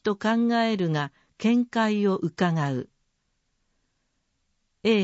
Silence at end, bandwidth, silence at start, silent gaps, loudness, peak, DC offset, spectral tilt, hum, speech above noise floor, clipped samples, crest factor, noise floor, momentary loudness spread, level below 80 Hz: 0 s; 8 kHz; 0.05 s; none; -25 LUFS; -10 dBFS; under 0.1%; -6.5 dB/octave; none; 50 dB; under 0.1%; 16 dB; -74 dBFS; 7 LU; -70 dBFS